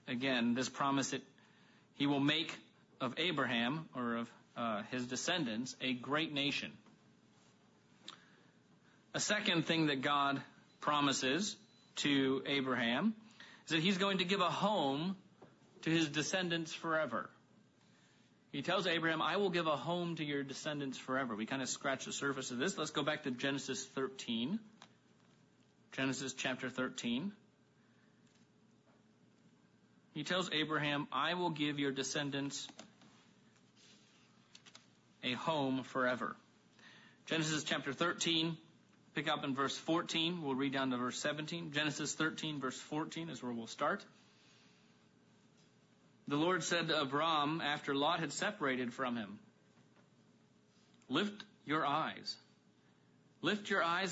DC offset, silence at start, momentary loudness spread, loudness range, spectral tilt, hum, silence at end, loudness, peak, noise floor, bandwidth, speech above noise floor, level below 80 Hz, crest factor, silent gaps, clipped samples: under 0.1%; 0.05 s; 10 LU; 7 LU; -2.5 dB/octave; none; 0 s; -37 LUFS; -18 dBFS; -69 dBFS; 7.6 kHz; 32 dB; -82 dBFS; 20 dB; none; under 0.1%